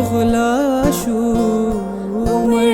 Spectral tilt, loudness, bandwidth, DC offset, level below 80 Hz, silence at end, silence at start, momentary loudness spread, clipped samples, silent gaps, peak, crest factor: -6 dB/octave; -17 LUFS; 17 kHz; under 0.1%; -32 dBFS; 0 s; 0 s; 6 LU; under 0.1%; none; -2 dBFS; 14 dB